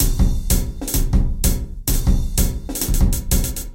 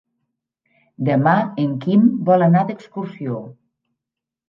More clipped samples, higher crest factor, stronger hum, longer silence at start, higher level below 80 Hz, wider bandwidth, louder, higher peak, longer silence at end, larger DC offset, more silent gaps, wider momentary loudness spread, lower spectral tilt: neither; about the same, 16 dB vs 18 dB; neither; second, 0 s vs 1 s; first, -18 dBFS vs -68 dBFS; first, 17 kHz vs 5.6 kHz; second, -21 LUFS vs -18 LUFS; about the same, -2 dBFS vs -2 dBFS; second, 0 s vs 0.95 s; neither; neither; second, 4 LU vs 14 LU; second, -4.5 dB/octave vs -10.5 dB/octave